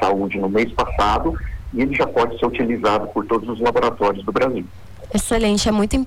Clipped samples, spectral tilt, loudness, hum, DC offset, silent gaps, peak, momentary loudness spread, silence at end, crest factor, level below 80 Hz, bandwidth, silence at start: under 0.1%; -5 dB/octave; -20 LUFS; none; under 0.1%; none; -10 dBFS; 6 LU; 0 s; 10 dB; -32 dBFS; 18 kHz; 0 s